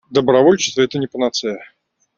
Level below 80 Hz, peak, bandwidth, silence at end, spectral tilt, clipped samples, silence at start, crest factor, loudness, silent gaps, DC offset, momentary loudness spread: -58 dBFS; 0 dBFS; 7.6 kHz; 0.5 s; -4.5 dB/octave; under 0.1%; 0.1 s; 16 dB; -16 LUFS; none; under 0.1%; 12 LU